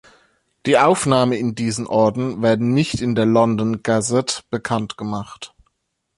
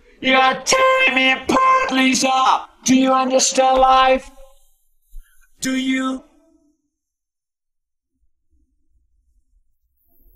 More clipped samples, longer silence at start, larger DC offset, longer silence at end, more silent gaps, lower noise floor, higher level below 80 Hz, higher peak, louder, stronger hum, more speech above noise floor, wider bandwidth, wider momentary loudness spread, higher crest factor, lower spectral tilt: neither; first, 0.65 s vs 0.2 s; neither; second, 0.7 s vs 4.15 s; neither; second, -71 dBFS vs -86 dBFS; second, -52 dBFS vs -46 dBFS; about the same, -2 dBFS vs 0 dBFS; second, -19 LUFS vs -15 LUFS; neither; second, 53 dB vs 70 dB; second, 11.5 kHz vs 14.5 kHz; first, 12 LU vs 9 LU; about the same, 16 dB vs 18 dB; first, -5.5 dB/octave vs -1.5 dB/octave